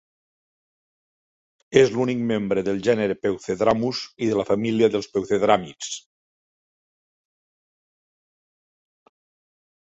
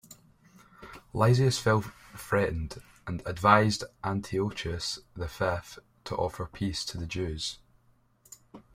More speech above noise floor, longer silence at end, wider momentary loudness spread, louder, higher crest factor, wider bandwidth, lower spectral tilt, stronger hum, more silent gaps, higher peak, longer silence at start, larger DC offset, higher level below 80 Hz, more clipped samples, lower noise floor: first, over 69 dB vs 36 dB; first, 3.95 s vs 0.15 s; second, 8 LU vs 22 LU; first, -22 LUFS vs -29 LUFS; about the same, 22 dB vs 24 dB; second, 8 kHz vs 16 kHz; about the same, -5.5 dB/octave vs -5.5 dB/octave; neither; neither; first, -2 dBFS vs -6 dBFS; first, 1.7 s vs 0.1 s; neither; second, -58 dBFS vs -50 dBFS; neither; first, under -90 dBFS vs -65 dBFS